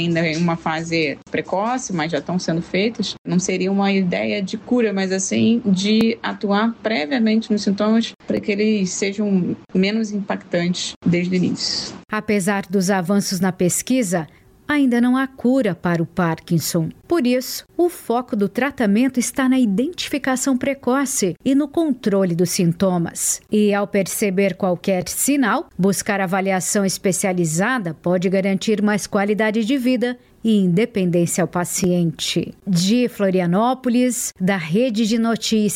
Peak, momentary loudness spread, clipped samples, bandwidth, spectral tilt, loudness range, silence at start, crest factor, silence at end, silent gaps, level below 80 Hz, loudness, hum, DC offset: -8 dBFS; 5 LU; under 0.1%; 16.5 kHz; -5 dB/octave; 2 LU; 0 s; 10 dB; 0 s; 3.18-3.25 s, 8.15-8.19 s, 10.96-11.01 s; -56 dBFS; -19 LUFS; none; under 0.1%